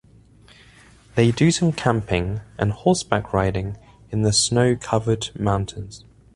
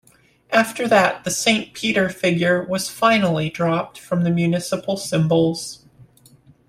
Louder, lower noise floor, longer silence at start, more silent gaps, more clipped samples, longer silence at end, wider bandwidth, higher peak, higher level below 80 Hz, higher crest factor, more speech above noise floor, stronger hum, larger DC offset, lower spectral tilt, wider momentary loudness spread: about the same, -21 LUFS vs -19 LUFS; about the same, -50 dBFS vs -52 dBFS; first, 1.15 s vs 0.5 s; neither; neither; second, 0.4 s vs 0.65 s; second, 11.5 kHz vs 15.5 kHz; about the same, 0 dBFS vs -2 dBFS; first, -42 dBFS vs -56 dBFS; about the same, 20 dB vs 18 dB; about the same, 30 dB vs 32 dB; neither; neither; about the same, -5 dB/octave vs -4.5 dB/octave; first, 12 LU vs 8 LU